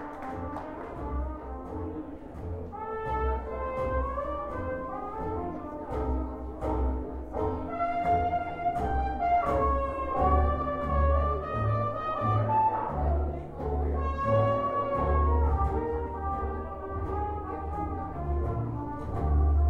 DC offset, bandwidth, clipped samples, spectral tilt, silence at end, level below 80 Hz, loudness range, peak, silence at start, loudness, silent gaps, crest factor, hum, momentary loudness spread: under 0.1%; 4.4 kHz; under 0.1%; -9.5 dB/octave; 0 s; -34 dBFS; 6 LU; -12 dBFS; 0 s; -30 LUFS; none; 16 dB; none; 11 LU